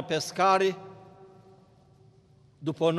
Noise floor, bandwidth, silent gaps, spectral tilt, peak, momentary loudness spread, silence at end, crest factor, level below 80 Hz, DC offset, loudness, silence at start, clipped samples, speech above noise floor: -59 dBFS; 13 kHz; none; -4.5 dB/octave; -10 dBFS; 19 LU; 0 s; 20 dB; -72 dBFS; under 0.1%; -26 LUFS; 0 s; under 0.1%; 33 dB